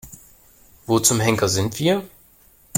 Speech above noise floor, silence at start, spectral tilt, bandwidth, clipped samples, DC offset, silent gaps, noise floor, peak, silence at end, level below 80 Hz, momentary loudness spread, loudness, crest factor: 34 dB; 0.05 s; -4 dB/octave; 17 kHz; under 0.1%; under 0.1%; none; -53 dBFS; -2 dBFS; 0 s; -52 dBFS; 8 LU; -19 LUFS; 20 dB